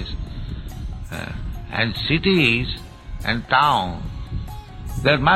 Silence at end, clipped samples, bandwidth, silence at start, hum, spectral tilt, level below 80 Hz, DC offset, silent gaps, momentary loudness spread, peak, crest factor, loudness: 0 s; under 0.1%; 16 kHz; 0 s; none; -6 dB/octave; -34 dBFS; under 0.1%; none; 17 LU; -4 dBFS; 18 dB; -21 LUFS